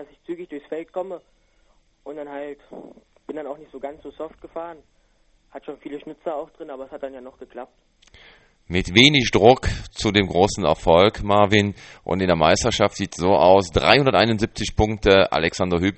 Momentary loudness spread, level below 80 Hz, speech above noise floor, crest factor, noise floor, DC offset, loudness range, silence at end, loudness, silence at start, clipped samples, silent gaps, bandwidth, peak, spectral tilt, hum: 21 LU; -40 dBFS; 40 dB; 22 dB; -60 dBFS; under 0.1%; 19 LU; 0.05 s; -18 LUFS; 0 s; under 0.1%; none; 8.8 kHz; 0 dBFS; -4.5 dB/octave; none